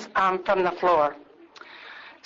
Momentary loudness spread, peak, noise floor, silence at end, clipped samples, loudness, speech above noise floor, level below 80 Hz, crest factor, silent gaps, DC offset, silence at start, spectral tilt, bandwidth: 21 LU; -10 dBFS; -48 dBFS; 0.15 s; under 0.1%; -23 LUFS; 25 dB; -60 dBFS; 16 dB; none; under 0.1%; 0 s; -5.5 dB/octave; 7.6 kHz